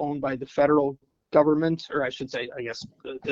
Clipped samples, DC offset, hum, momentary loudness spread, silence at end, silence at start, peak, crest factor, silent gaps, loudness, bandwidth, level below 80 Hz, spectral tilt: under 0.1%; under 0.1%; none; 14 LU; 0 s; 0 s; -6 dBFS; 20 dB; none; -25 LUFS; 7.6 kHz; -60 dBFS; -6.5 dB/octave